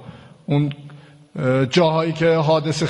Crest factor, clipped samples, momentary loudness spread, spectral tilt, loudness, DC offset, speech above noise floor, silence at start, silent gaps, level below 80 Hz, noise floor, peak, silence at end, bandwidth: 16 dB; under 0.1%; 19 LU; -6.5 dB/octave; -19 LUFS; under 0.1%; 24 dB; 0 s; none; -56 dBFS; -42 dBFS; -2 dBFS; 0 s; 11 kHz